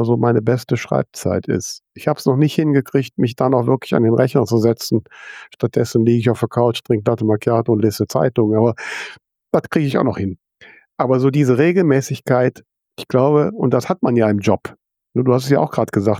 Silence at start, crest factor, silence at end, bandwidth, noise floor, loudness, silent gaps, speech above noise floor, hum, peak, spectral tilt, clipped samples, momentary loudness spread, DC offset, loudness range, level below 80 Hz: 0 s; 16 dB; 0 s; 16 kHz; -47 dBFS; -17 LUFS; none; 31 dB; none; -2 dBFS; -7 dB/octave; under 0.1%; 9 LU; under 0.1%; 2 LU; -56 dBFS